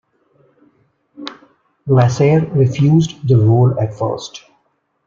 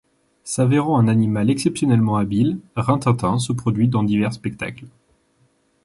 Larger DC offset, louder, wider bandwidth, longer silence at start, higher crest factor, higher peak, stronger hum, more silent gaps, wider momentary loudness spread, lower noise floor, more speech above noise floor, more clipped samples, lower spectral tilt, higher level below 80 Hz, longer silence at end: neither; first, -14 LUFS vs -19 LUFS; second, 7.4 kHz vs 11.5 kHz; first, 1.2 s vs 0.45 s; about the same, 14 dB vs 16 dB; about the same, -2 dBFS vs -4 dBFS; neither; neither; first, 20 LU vs 10 LU; about the same, -64 dBFS vs -62 dBFS; first, 51 dB vs 43 dB; neither; about the same, -8 dB/octave vs -7 dB/octave; about the same, -50 dBFS vs -50 dBFS; second, 0.7 s vs 0.95 s